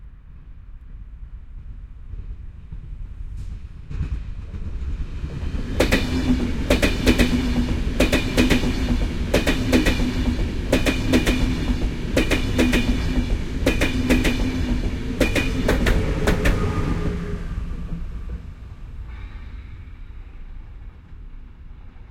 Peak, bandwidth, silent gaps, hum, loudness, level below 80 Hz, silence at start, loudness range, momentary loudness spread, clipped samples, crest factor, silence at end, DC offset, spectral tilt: -2 dBFS; 16.5 kHz; none; none; -22 LUFS; -26 dBFS; 0 s; 18 LU; 22 LU; under 0.1%; 20 dB; 0.05 s; under 0.1%; -5.5 dB/octave